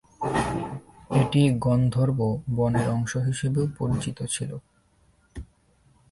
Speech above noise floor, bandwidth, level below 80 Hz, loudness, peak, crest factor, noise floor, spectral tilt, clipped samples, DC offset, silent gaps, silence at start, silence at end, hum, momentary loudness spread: 39 dB; 11.5 kHz; -48 dBFS; -25 LUFS; -8 dBFS; 16 dB; -63 dBFS; -6.5 dB/octave; under 0.1%; under 0.1%; none; 0.2 s; 0.65 s; none; 20 LU